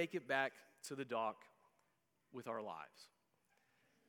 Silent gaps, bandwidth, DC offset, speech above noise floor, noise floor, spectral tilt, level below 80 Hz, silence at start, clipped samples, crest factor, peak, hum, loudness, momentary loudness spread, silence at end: none; 18 kHz; under 0.1%; 38 dB; -83 dBFS; -4 dB/octave; under -90 dBFS; 0 s; under 0.1%; 24 dB; -24 dBFS; none; -44 LUFS; 19 LU; 1 s